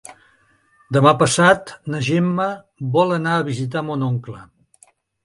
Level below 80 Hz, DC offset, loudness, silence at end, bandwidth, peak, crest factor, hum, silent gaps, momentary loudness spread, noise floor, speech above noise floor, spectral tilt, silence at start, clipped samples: -56 dBFS; under 0.1%; -18 LUFS; 0.8 s; 11.5 kHz; 0 dBFS; 20 dB; none; none; 13 LU; -58 dBFS; 40 dB; -5.5 dB/octave; 0.1 s; under 0.1%